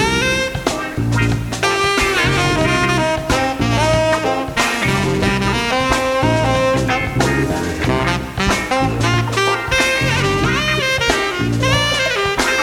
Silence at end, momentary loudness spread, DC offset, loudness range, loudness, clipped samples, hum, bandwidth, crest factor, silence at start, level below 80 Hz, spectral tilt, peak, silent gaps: 0 s; 4 LU; under 0.1%; 1 LU; -16 LUFS; under 0.1%; none; 16.5 kHz; 14 dB; 0 s; -30 dBFS; -4.5 dB/octave; -2 dBFS; none